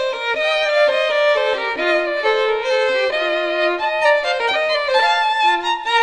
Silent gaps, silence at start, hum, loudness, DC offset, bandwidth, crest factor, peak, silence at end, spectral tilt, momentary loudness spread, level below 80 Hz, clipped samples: none; 0 s; none; -17 LUFS; under 0.1%; 10.5 kHz; 14 dB; -4 dBFS; 0 s; -1 dB/octave; 3 LU; -56 dBFS; under 0.1%